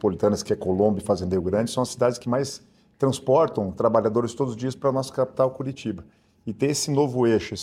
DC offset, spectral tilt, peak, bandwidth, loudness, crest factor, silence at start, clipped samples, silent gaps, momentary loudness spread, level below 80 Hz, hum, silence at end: under 0.1%; -6 dB/octave; -6 dBFS; 15.5 kHz; -24 LUFS; 18 dB; 0.05 s; under 0.1%; none; 10 LU; -56 dBFS; none; 0 s